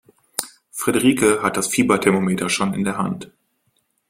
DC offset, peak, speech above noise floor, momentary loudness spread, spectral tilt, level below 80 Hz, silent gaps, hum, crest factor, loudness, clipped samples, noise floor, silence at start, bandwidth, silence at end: under 0.1%; 0 dBFS; 49 dB; 12 LU; -4.5 dB/octave; -54 dBFS; none; none; 20 dB; -19 LUFS; under 0.1%; -68 dBFS; 0.4 s; 16.5 kHz; 0.85 s